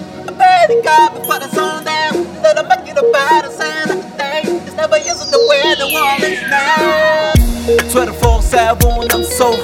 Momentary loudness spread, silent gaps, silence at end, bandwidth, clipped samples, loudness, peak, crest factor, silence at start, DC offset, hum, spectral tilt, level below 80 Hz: 8 LU; none; 0 s; 18 kHz; under 0.1%; -12 LUFS; 0 dBFS; 12 dB; 0 s; under 0.1%; none; -4 dB/octave; -22 dBFS